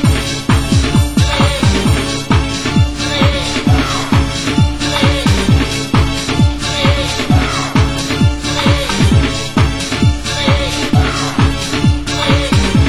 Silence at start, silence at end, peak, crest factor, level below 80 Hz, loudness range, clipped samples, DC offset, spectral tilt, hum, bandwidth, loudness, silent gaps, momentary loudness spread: 0 s; 0 s; 0 dBFS; 12 dB; -20 dBFS; 1 LU; under 0.1%; under 0.1%; -5 dB/octave; none; 16 kHz; -13 LUFS; none; 3 LU